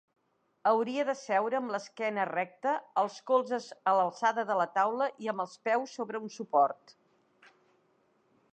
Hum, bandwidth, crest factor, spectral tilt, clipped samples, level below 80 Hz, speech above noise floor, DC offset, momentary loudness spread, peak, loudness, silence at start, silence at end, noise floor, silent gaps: none; 9 kHz; 18 dB; -4.5 dB/octave; under 0.1%; under -90 dBFS; 40 dB; under 0.1%; 8 LU; -14 dBFS; -31 LUFS; 0.65 s; 1.8 s; -71 dBFS; none